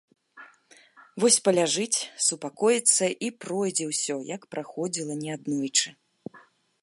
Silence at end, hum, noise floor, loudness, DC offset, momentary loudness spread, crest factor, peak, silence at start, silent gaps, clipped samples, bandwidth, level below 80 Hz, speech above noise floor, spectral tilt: 0.45 s; none; -57 dBFS; -25 LUFS; under 0.1%; 15 LU; 22 dB; -6 dBFS; 0.35 s; none; under 0.1%; 11.5 kHz; -80 dBFS; 31 dB; -2.5 dB/octave